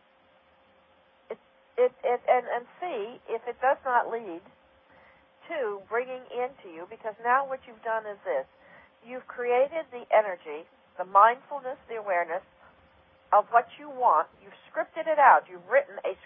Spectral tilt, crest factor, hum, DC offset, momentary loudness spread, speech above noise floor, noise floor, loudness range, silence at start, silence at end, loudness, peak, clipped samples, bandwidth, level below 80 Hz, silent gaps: -7 dB/octave; 22 dB; none; under 0.1%; 20 LU; 35 dB; -62 dBFS; 7 LU; 1.3 s; 0.1 s; -27 LUFS; -6 dBFS; under 0.1%; 3.7 kHz; -76 dBFS; none